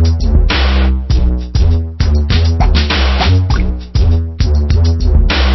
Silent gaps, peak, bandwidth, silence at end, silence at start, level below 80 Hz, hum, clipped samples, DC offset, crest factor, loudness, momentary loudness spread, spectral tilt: none; 0 dBFS; 6 kHz; 0 s; 0 s; -12 dBFS; none; under 0.1%; under 0.1%; 10 dB; -13 LUFS; 3 LU; -6.5 dB/octave